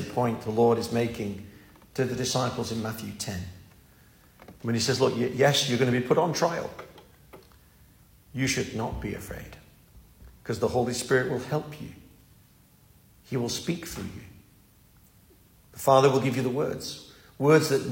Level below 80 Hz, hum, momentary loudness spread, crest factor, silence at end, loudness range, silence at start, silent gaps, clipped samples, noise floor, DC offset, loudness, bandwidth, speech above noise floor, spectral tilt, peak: -54 dBFS; none; 20 LU; 22 dB; 0 s; 9 LU; 0 s; none; under 0.1%; -58 dBFS; under 0.1%; -27 LUFS; 16.5 kHz; 32 dB; -5 dB/octave; -8 dBFS